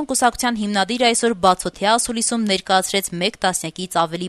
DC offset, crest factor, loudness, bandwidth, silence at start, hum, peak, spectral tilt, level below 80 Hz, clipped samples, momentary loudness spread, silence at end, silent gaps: under 0.1%; 18 dB; -19 LUFS; 13.5 kHz; 0 s; none; -2 dBFS; -2.5 dB/octave; -50 dBFS; under 0.1%; 5 LU; 0 s; none